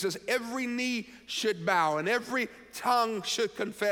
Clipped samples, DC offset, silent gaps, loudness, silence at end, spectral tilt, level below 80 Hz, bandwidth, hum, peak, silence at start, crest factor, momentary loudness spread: under 0.1%; under 0.1%; none; -30 LUFS; 0 s; -3 dB/octave; -70 dBFS; 17.5 kHz; none; -14 dBFS; 0 s; 16 dB; 7 LU